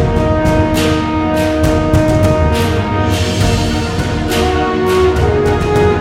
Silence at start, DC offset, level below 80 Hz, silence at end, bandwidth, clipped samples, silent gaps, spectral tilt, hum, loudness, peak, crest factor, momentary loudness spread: 0 s; under 0.1%; -22 dBFS; 0 s; 16 kHz; under 0.1%; none; -6 dB/octave; none; -13 LUFS; 0 dBFS; 12 dB; 3 LU